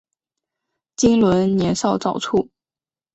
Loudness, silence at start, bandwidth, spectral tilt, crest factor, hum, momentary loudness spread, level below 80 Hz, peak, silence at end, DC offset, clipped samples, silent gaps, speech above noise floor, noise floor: -18 LUFS; 1 s; 8.2 kHz; -5.5 dB/octave; 16 dB; none; 9 LU; -48 dBFS; -4 dBFS; 0.7 s; under 0.1%; under 0.1%; none; over 73 dB; under -90 dBFS